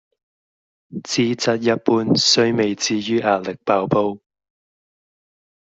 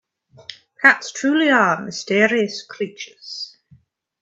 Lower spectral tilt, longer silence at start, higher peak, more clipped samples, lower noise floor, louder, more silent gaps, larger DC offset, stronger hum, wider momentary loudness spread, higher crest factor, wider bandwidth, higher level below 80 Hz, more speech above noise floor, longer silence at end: about the same, -4 dB/octave vs -3.5 dB/octave; first, 0.9 s vs 0.5 s; about the same, -2 dBFS vs 0 dBFS; neither; first, under -90 dBFS vs -54 dBFS; about the same, -18 LUFS vs -18 LUFS; neither; neither; neither; second, 10 LU vs 23 LU; about the same, 18 dB vs 20 dB; about the same, 8.2 kHz vs 8.4 kHz; first, -60 dBFS vs -68 dBFS; first, over 71 dB vs 36 dB; first, 1.6 s vs 0.75 s